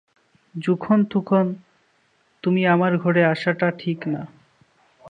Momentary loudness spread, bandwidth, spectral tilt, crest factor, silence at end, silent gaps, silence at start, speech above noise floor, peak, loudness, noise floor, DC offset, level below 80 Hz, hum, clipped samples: 12 LU; 7.2 kHz; -8.5 dB/octave; 18 dB; 0 s; none; 0.55 s; 43 dB; -4 dBFS; -21 LUFS; -63 dBFS; under 0.1%; -68 dBFS; none; under 0.1%